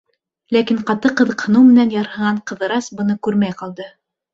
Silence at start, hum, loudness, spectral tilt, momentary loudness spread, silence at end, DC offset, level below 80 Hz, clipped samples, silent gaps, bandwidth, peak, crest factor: 0.5 s; none; -16 LUFS; -6 dB/octave; 14 LU; 0.45 s; under 0.1%; -58 dBFS; under 0.1%; none; 7.6 kHz; -2 dBFS; 14 dB